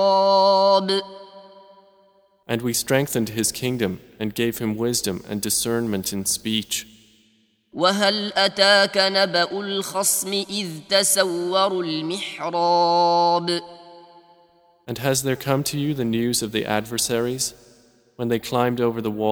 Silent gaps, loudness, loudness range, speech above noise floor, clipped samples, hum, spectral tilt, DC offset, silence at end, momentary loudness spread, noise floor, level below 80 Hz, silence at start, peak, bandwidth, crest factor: none; -21 LUFS; 5 LU; 40 dB; under 0.1%; none; -3 dB/octave; under 0.1%; 0 s; 10 LU; -62 dBFS; -58 dBFS; 0 s; -2 dBFS; over 20 kHz; 20 dB